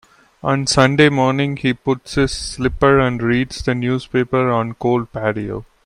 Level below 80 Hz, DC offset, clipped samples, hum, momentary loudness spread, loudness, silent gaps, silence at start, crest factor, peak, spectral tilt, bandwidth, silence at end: -38 dBFS; under 0.1%; under 0.1%; none; 8 LU; -17 LUFS; none; 0.45 s; 18 dB; 0 dBFS; -5.5 dB/octave; 11 kHz; 0.25 s